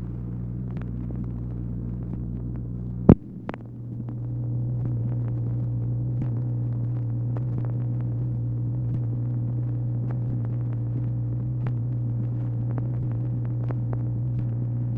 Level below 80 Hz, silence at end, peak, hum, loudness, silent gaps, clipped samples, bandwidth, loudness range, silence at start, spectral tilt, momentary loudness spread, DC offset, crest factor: -40 dBFS; 0 s; 0 dBFS; none; -28 LUFS; none; under 0.1%; 2.7 kHz; 2 LU; 0 s; -12.5 dB/octave; 5 LU; under 0.1%; 26 dB